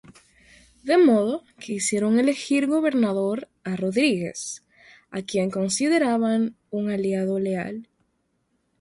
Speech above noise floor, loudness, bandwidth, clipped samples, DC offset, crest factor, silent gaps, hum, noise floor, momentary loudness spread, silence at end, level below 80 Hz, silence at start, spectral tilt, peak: 49 dB; -23 LUFS; 11.5 kHz; under 0.1%; under 0.1%; 16 dB; none; none; -71 dBFS; 14 LU; 0.95 s; -66 dBFS; 0.1 s; -5 dB/octave; -8 dBFS